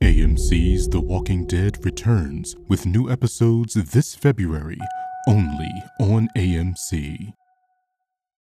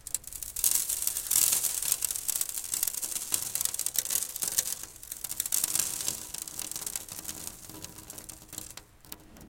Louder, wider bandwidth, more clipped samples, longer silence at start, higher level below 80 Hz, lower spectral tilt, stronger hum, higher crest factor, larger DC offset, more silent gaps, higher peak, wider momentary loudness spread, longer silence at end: first, -21 LUFS vs -29 LUFS; second, 14.5 kHz vs 17 kHz; neither; about the same, 0 s vs 0.05 s; first, -26 dBFS vs -60 dBFS; first, -6.5 dB/octave vs 1 dB/octave; neither; second, 16 dB vs 28 dB; neither; neither; about the same, -4 dBFS vs -6 dBFS; second, 11 LU vs 18 LU; first, 1.2 s vs 0 s